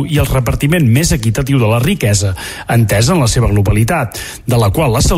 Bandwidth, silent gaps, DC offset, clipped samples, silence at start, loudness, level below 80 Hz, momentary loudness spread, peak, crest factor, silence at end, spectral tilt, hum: 16 kHz; none; under 0.1%; under 0.1%; 0 s; -13 LUFS; -24 dBFS; 5 LU; -2 dBFS; 10 dB; 0 s; -5.5 dB/octave; none